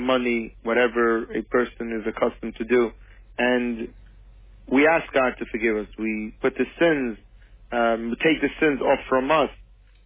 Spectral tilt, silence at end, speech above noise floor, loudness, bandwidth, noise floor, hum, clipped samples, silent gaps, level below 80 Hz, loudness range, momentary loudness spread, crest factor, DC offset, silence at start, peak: -9 dB/octave; 0.45 s; 25 dB; -23 LUFS; 3.8 kHz; -47 dBFS; none; under 0.1%; none; -48 dBFS; 3 LU; 9 LU; 16 dB; under 0.1%; 0 s; -8 dBFS